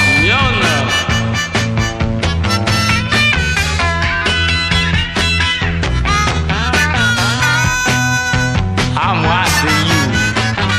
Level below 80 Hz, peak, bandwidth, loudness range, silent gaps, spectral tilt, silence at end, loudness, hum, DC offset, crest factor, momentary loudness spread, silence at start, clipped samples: -24 dBFS; 0 dBFS; 15.5 kHz; 1 LU; none; -4 dB/octave; 0 s; -13 LUFS; none; under 0.1%; 14 dB; 4 LU; 0 s; under 0.1%